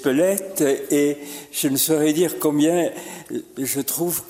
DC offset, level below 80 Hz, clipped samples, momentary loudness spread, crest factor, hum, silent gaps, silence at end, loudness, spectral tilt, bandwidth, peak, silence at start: under 0.1%; -64 dBFS; under 0.1%; 13 LU; 20 dB; none; none; 0 s; -21 LUFS; -4 dB/octave; 16.5 kHz; 0 dBFS; 0 s